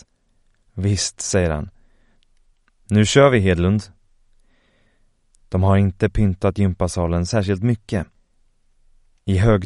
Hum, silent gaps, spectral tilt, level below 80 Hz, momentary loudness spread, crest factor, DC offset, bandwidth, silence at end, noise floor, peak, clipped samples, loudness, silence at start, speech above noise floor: none; none; -6 dB/octave; -36 dBFS; 12 LU; 20 dB; under 0.1%; 11.5 kHz; 0 s; -61 dBFS; 0 dBFS; under 0.1%; -19 LUFS; 0.75 s; 43 dB